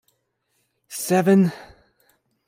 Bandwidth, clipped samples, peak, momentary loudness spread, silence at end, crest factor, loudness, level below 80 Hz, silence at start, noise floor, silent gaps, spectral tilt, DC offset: 16 kHz; under 0.1%; -8 dBFS; 19 LU; 0.85 s; 16 dB; -20 LUFS; -64 dBFS; 0.9 s; -71 dBFS; none; -6 dB/octave; under 0.1%